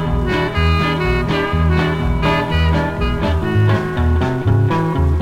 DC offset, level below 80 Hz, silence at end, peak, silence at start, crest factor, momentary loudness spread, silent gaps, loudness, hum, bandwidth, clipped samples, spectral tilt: under 0.1%; -22 dBFS; 0 s; -4 dBFS; 0 s; 12 dB; 2 LU; none; -17 LUFS; none; 11 kHz; under 0.1%; -7.5 dB/octave